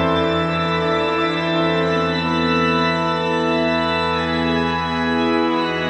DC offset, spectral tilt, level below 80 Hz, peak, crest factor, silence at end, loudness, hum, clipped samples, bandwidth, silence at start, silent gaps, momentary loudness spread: under 0.1%; -6 dB/octave; -42 dBFS; -6 dBFS; 12 dB; 0 s; -18 LUFS; none; under 0.1%; 9.4 kHz; 0 s; none; 2 LU